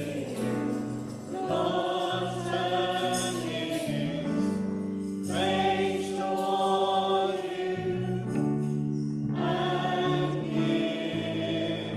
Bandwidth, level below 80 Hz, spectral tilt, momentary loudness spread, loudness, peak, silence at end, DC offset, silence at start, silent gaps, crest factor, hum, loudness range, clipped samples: 15 kHz; -62 dBFS; -5.5 dB/octave; 6 LU; -29 LUFS; -14 dBFS; 0 s; under 0.1%; 0 s; none; 14 dB; none; 2 LU; under 0.1%